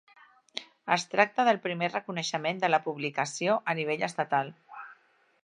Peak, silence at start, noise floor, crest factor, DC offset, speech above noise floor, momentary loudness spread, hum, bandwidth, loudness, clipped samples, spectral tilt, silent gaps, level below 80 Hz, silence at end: -6 dBFS; 0.55 s; -65 dBFS; 24 dB; under 0.1%; 37 dB; 16 LU; none; 11 kHz; -29 LUFS; under 0.1%; -4 dB/octave; none; -82 dBFS; 0.5 s